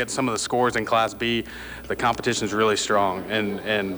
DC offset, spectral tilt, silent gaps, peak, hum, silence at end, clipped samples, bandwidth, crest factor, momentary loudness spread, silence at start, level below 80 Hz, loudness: under 0.1%; -3.5 dB/octave; none; -10 dBFS; none; 0 s; under 0.1%; over 20 kHz; 14 dB; 5 LU; 0 s; -50 dBFS; -23 LUFS